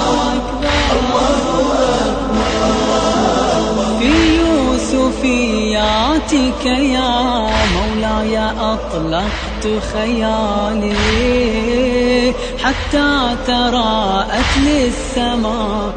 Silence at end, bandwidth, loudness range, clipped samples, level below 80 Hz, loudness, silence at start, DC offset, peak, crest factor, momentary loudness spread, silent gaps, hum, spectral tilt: 0 s; 9.4 kHz; 3 LU; under 0.1%; -26 dBFS; -15 LUFS; 0 s; under 0.1%; 0 dBFS; 14 dB; 5 LU; none; none; -4.5 dB/octave